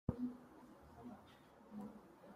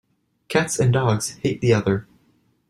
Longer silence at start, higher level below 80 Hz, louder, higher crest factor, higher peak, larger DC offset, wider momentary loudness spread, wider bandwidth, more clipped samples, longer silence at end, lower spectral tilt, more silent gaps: second, 0.1 s vs 0.5 s; second, -66 dBFS vs -52 dBFS; second, -53 LUFS vs -21 LUFS; first, 26 dB vs 18 dB; second, -26 dBFS vs -4 dBFS; neither; first, 14 LU vs 6 LU; first, 15.5 kHz vs 13.5 kHz; neither; second, 0 s vs 0.65 s; first, -8.5 dB/octave vs -5.5 dB/octave; neither